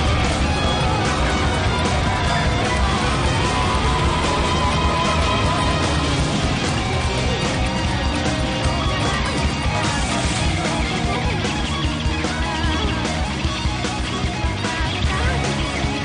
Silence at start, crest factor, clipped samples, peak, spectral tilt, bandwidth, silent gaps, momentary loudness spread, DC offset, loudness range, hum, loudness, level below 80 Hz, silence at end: 0 s; 10 dB; under 0.1%; -10 dBFS; -4.5 dB/octave; 10 kHz; none; 3 LU; under 0.1%; 3 LU; none; -20 LUFS; -26 dBFS; 0 s